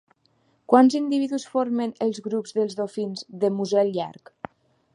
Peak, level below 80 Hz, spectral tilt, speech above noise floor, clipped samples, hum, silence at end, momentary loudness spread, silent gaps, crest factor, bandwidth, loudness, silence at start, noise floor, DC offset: -2 dBFS; -74 dBFS; -6 dB/octave; 43 dB; under 0.1%; none; 0.8 s; 18 LU; none; 22 dB; 11 kHz; -23 LUFS; 0.7 s; -66 dBFS; under 0.1%